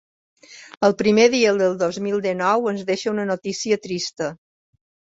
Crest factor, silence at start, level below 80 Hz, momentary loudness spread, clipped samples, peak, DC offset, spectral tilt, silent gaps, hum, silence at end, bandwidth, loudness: 18 dB; 0.5 s; -62 dBFS; 10 LU; under 0.1%; -2 dBFS; under 0.1%; -4.5 dB/octave; 0.77-0.81 s; none; 0.8 s; 8 kHz; -20 LUFS